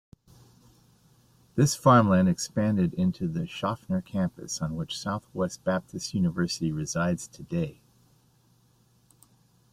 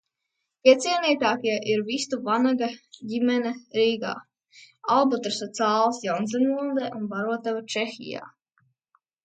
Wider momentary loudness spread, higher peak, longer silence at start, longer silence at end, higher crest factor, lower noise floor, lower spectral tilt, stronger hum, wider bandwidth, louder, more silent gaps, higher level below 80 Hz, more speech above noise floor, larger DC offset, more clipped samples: about the same, 12 LU vs 11 LU; second, -6 dBFS vs -2 dBFS; first, 1.55 s vs 0.65 s; first, 2 s vs 0.95 s; about the same, 22 dB vs 24 dB; second, -64 dBFS vs -81 dBFS; first, -6 dB/octave vs -4 dB/octave; neither; first, 14.5 kHz vs 9.2 kHz; second, -27 LUFS vs -24 LUFS; neither; first, -58 dBFS vs -76 dBFS; second, 37 dB vs 57 dB; neither; neither